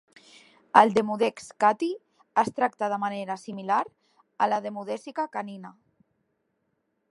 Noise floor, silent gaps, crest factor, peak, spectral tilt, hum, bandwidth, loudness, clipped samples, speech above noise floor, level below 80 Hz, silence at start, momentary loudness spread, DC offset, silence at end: -76 dBFS; none; 28 dB; 0 dBFS; -5 dB/octave; none; 11.5 kHz; -26 LUFS; under 0.1%; 50 dB; -74 dBFS; 0.75 s; 14 LU; under 0.1%; 1.4 s